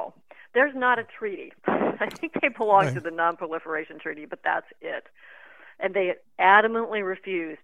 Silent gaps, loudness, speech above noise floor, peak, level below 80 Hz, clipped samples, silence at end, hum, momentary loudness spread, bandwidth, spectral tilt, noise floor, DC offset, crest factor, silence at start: none; -25 LUFS; 19 dB; -4 dBFS; -72 dBFS; under 0.1%; 0.1 s; none; 16 LU; 11.5 kHz; -6 dB/octave; -44 dBFS; 0.1%; 22 dB; 0 s